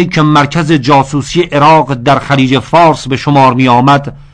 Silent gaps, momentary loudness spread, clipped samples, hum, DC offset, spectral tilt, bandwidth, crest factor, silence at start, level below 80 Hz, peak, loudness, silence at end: none; 5 LU; 0.3%; none; under 0.1%; -6 dB/octave; 10 kHz; 8 dB; 0 s; -36 dBFS; 0 dBFS; -8 LUFS; 0.15 s